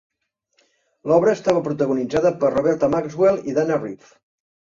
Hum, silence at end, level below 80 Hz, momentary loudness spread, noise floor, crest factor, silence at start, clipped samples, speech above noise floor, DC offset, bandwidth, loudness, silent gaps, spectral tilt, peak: none; 0.8 s; -56 dBFS; 7 LU; -68 dBFS; 18 dB; 1.05 s; under 0.1%; 48 dB; under 0.1%; 7.6 kHz; -20 LUFS; none; -7 dB/octave; -4 dBFS